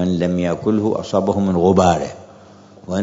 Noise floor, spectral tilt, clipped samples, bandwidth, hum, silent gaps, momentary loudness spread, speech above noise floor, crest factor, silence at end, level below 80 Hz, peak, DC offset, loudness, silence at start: -43 dBFS; -7 dB/octave; under 0.1%; 7.8 kHz; none; none; 8 LU; 27 dB; 16 dB; 0 s; -52 dBFS; -2 dBFS; under 0.1%; -17 LUFS; 0 s